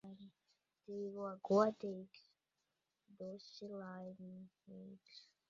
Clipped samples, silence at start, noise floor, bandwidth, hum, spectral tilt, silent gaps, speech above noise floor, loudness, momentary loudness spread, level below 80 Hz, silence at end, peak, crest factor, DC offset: under 0.1%; 0.05 s; -89 dBFS; 7.4 kHz; none; -6 dB/octave; none; 46 dB; -42 LUFS; 25 LU; -88 dBFS; 0.25 s; -20 dBFS; 26 dB; under 0.1%